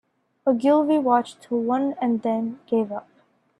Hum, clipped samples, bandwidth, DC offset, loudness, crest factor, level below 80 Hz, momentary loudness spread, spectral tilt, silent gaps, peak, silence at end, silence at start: none; under 0.1%; 11 kHz; under 0.1%; -23 LUFS; 18 dB; -72 dBFS; 8 LU; -7 dB/octave; none; -6 dBFS; 0.6 s; 0.45 s